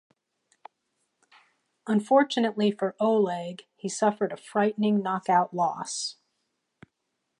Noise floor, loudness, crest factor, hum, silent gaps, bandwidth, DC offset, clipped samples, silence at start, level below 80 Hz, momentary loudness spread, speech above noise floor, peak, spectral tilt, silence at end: -80 dBFS; -26 LUFS; 20 dB; none; none; 11 kHz; under 0.1%; under 0.1%; 1.85 s; -80 dBFS; 12 LU; 55 dB; -8 dBFS; -5 dB/octave; 1.3 s